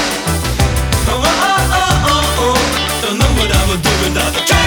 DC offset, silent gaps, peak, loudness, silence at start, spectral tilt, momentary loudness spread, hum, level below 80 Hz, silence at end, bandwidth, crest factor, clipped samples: under 0.1%; none; 0 dBFS; -13 LUFS; 0 s; -3.5 dB/octave; 3 LU; none; -20 dBFS; 0 s; over 20 kHz; 12 dB; under 0.1%